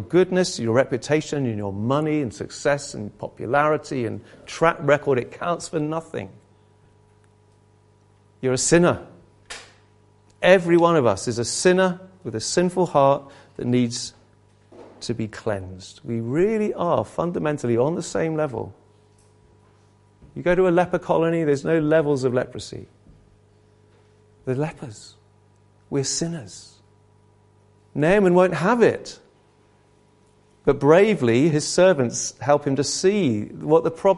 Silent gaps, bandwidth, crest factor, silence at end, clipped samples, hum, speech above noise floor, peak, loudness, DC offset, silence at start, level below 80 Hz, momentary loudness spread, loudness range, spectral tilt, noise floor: none; 11.5 kHz; 22 dB; 0 s; under 0.1%; 50 Hz at -55 dBFS; 37 dB; -2 dBFS; -21 LUFS; under 0.1%; 0 s; -54 dBFS; 17 LU; 10 LU; -5 dB/octave; -58 dBFS